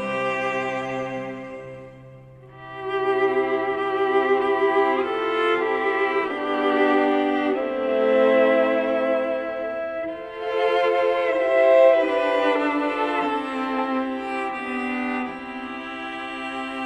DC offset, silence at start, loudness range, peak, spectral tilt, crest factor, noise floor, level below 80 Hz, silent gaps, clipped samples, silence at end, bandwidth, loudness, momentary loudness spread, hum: under 0.1%; 0 s; 7 LU; -6 dBFS; -5.5 dB/octave; 16 dB; -44 dBFS; -60 dBFS; none; under 0.1%; 0 s; 9.6 kHz; -22 LUFS; 13 LU; none